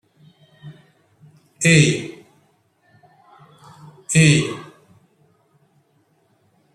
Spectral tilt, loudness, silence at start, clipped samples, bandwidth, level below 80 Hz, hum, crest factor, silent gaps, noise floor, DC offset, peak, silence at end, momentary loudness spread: -4.5 dB/octave; -16 LUFS; 0.65 s; under 0.1%; 12.5 kHz; -56 dBFS; none; 22 dB; none; -62 dBFS; under 0.1%; -2 dBFS; 2.1 s; 22 LU